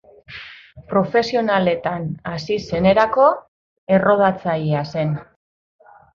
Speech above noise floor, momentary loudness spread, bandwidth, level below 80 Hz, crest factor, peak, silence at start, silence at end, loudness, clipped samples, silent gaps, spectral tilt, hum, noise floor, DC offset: 23 dB; 16 LU; 7.2 kHz; -50 dBFS; 18 dB; -2 dBFS; 0.3 s; 0.9 s; -19 LUFS; under 0.1%; 3.48-3.87 s; -7 dB/octave; none; -41 dBFS; under 0.1%